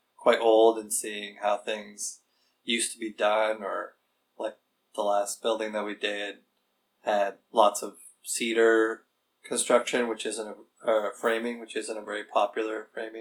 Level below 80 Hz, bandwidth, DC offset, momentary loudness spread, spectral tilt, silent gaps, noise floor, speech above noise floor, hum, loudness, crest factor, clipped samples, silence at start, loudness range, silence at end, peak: -88 dBFS; 19.5 kHz; under 0.1%; 15 LU; -1.5 dB/octave; none; -75 dBFS; 47 dB; none; -28 LUFS; 22 dB; under 0.1%; 0.2 s; 5 LU; 0 s; -6 dBFS